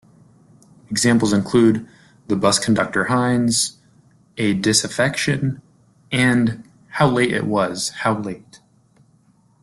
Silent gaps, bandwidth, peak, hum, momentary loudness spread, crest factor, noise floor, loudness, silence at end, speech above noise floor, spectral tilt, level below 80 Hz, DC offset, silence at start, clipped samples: none; 12.5 kHz; -2 dBFS; none; 10 LU; 18 dB; -57 dBFS; -19 LUFS; 1.05 s; 39 dB; -4.5 dB/octave; -54 dBFS; under 0.1%; 0.9 s; under 0.1%